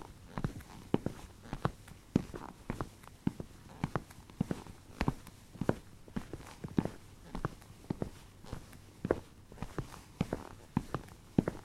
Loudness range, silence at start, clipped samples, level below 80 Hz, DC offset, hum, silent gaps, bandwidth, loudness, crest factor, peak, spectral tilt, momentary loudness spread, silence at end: 3 LU; 0 s; under 0.1%; -52 dBFS; under 0.1%; none; none; 16 kHz; -40 LUFS; 30 dB; -10 dBFS; -7 dB/octave; 14 LU; 0 s